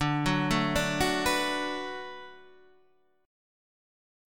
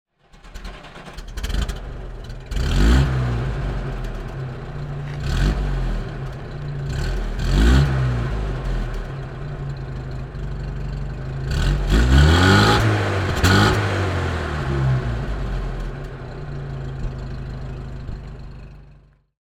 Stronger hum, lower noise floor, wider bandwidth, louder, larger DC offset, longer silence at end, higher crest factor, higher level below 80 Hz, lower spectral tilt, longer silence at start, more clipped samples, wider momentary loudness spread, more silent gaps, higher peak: neither; first, -68 dBFS vs -50 dBFS; first, 17.5 kHz vs 15 kHz; second, -28 LUFS vs -22 LUFS; first, 0.3% vs under 0.1%; first, 1 s vs 0.55 s; about the same, 20 dB vs 20 dB; second, -48 dBFS vs -24 dBFS; second, -4.5 dB/octave vs -6 dB/octave; second, 0 s vs 0.35 s; neither; about the same, 16 LU vs 18 LU; neither; second, -12 dBFS vs -2 dBFS